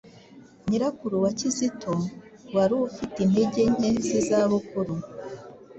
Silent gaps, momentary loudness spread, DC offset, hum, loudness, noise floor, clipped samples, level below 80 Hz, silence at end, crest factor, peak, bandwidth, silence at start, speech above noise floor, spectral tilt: none; 13 LU; under 0.1%; none; -25 LUFS; -50 dBFS; under 0.1%; -56 dBFS; 0 s; 16 dB; -10 dBFS; 8.4 kHz; 0.05 s; 26 dB; -6 dB/octave